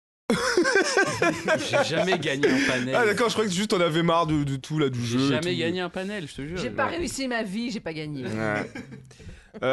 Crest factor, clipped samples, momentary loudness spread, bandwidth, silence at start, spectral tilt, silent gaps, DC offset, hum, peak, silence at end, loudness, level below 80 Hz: 16 dB; under 0.1%; 11 LU; 12.5 kHz; 0.3 s; -4.5 dB/octave; none; under 0.1%; none; -8 dBFS; 0 s; -25 LUFS; -52 dBFS